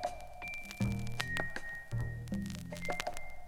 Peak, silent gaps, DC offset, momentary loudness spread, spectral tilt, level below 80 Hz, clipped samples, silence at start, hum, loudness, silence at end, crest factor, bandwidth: -12 dBFS; none; under 0.1%; 6 LU; -5 dB/octave; -48 dBFS; under 0.1%; 0 s; none; -40 LUFS; 0 s; 26 dB; 17 kHz